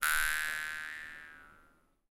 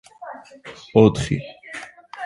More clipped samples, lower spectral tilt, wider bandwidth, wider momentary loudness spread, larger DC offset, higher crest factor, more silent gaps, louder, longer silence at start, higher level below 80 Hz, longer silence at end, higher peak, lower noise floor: neither; second, 1.5 dB/octave vs -7 dB/octave; first, 17 kHz vs 11.5 kHz; about the same, 22 LU vs 23 LU; neither; about the same, 24 dB vs 22 dB; neither; second, -34 LUFS vs -19 LUFS; second, 0 s vs 0.2 s; second, -54 dBFS vs -46 dBFS; first, 0.55 s vs 0 s; second, -12 dBFS vs 0 dBFS; first, -67 dBFS vs -38 dBFS